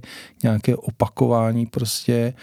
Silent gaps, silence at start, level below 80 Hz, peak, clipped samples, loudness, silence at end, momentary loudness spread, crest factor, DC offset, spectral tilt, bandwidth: none; 0.05 s; -54 dBFS; -2 dBFS; under 0.1%; -21 LUFS; 0.1 s; 5 LU; 20 dB; under 0.1%; -6 dB/octave; 16.5 kHz